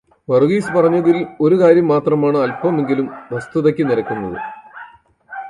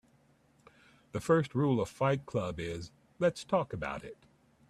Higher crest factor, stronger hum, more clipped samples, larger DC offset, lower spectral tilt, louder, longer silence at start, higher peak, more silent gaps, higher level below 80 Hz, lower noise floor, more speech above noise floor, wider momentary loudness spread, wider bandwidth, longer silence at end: about the same, 16 dB vs 20 dB; neither; neither; neither; about the same, -8 dB/octave vs -7 dB/octave; first, -16 LUFS vs -33 LUFS; second, 0.3 s vs 1.15 s; first, 0 dBFS vs -14 dBFS; neither; first, -56 dBFS vs -62 dBFS; second, -43 dBFS vs -67 dBFS; second, 28 dB vs 35 dB; about the same, 15 LU vs 14 LU; second, 11.5 kHz vs 13.5 kHz; second, 0 s vs 0.55 s